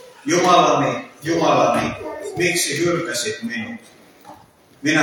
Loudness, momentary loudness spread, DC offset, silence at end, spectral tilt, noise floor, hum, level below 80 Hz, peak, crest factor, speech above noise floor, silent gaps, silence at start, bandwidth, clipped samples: -19 LUFS; 14 LU; under 0.1%; 0 s; -3.5 dB/octave; -49 dBFS; none; -56 dBFS; -2 dBFS; 18 dB; 30 dB; none; 0.05 s; 19 kHz; under 0.1%